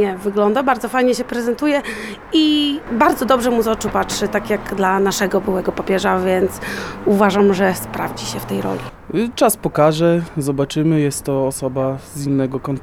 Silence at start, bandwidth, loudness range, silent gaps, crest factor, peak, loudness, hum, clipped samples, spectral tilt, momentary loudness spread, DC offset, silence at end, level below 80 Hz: 0 s; 19 kHz; 2 LU; none; 16 dB; 0 dBFS; -18 LUFS; none; under 0.1%; -5 dB/octave; 9 LU; 0.1%; 0 s; -44 dBFS